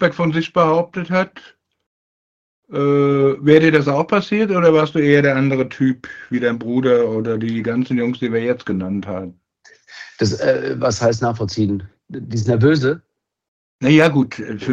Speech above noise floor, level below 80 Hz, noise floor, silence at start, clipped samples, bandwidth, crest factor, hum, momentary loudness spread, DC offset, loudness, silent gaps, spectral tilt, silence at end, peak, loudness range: 34 dB; -56 dBFS; -50 dBFS; 0 s; under 0.1%; 8.2 kHz; 18 dB; none; 13 LU; under 0.1%; -17 LUFS; 1.86-2.63 s, 13.48-13.79 s; -6.5 dB/octave; 0 s; 0 dBFS; 6 LU